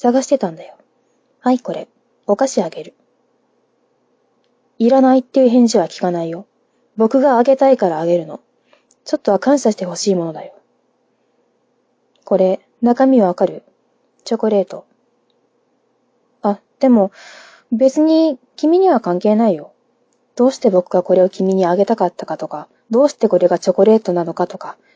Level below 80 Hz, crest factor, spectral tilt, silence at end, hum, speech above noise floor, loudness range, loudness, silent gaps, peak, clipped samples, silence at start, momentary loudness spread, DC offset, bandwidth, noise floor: -68 dBFS; 16 dB; -6 dB/octave; 0.25 s; none; 48 dB; 7 LU; -15 LUFS; none; 0 dBFS; under 0.1%; 0.05 s; 14 LU; under 0.1%; 8 kHz; -63 dBFS